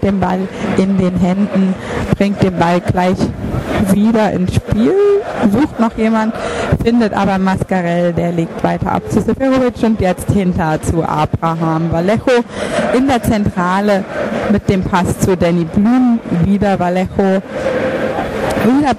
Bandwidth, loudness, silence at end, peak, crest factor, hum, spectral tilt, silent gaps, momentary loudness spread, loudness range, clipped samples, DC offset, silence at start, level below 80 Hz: 14.5 kHz; -14 LUFS; 0 s; 0 dBFS; 14 dB; none; -7 dB/octave; none; 5 LU; 1 LU; under 0.1%; under 0.1%; 0 s; -32 dBFS